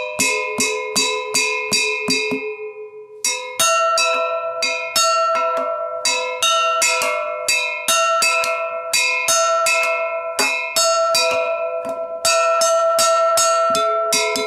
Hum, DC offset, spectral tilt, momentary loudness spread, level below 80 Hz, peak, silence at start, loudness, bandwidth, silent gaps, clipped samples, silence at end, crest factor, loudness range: none; under 0.1%; 0.5 dB/octave; 7 LU; -68 dBFS; -4 dBFS; 0 s; -17 LUFS; 16 kHz; none; under 0.1%; 0 s; 16 dB; 2 LU